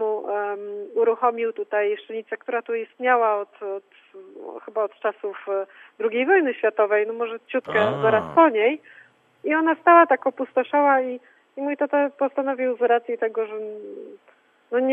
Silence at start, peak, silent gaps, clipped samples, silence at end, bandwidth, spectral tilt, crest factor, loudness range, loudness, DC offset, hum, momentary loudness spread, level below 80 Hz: 0 s; -2 dBFS; none; under 0.1%; 0 s; 4 kHz; -7.5 dB/octave; 20 dB; 7 LU; -22 LUFS; under 0.1%; none; 15 LU; -74 dBFS